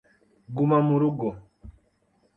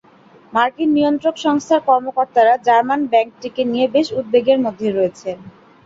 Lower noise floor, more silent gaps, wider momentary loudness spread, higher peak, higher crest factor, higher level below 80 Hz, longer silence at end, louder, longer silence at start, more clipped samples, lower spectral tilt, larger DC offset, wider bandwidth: first, -67 dBFS vs -47 dBFS; neither; first, 16 LU vs 8 LU; second, -8 dBFS vs -2 dBFS; about the same, 18 dB vs 16 dB; first, -56 dBFS vs -62 dBFS; first, 0.65 s vs 0.35 s; second, -24 LUFS vs -17 LUFS; about the same, 0.5 s vs 0.55 s; neither; first, -11.5 dB/octave vs -5 dB/octave; neither; second, 4 kHz vs 7.8 kHz